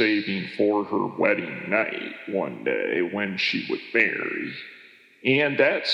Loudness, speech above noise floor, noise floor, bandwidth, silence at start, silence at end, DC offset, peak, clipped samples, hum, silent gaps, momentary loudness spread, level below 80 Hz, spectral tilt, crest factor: -24 LUFS; 26 dB; -51 dBFS; 7.6 kHz; 0 s; 0 s; under 0.1%; -4 dBFS; under 0.1%; none; none; 8 LU; -84 dBFS; -6 dB/octave; 20 dB